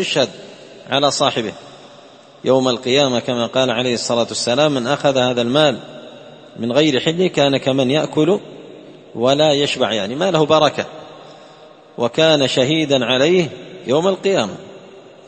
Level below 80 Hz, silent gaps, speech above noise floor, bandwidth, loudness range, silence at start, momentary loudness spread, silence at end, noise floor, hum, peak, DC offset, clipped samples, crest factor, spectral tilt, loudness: -58 dBFS; none; 27 dB; 8.8 kHz; 2 LU; 0 s; 14 LU; 0.2 s; -43 dBFS; none; 0 dBFS; under 0.1%; under 0.1%; 18 dB; -4.5 dB/octave; -16 LUFS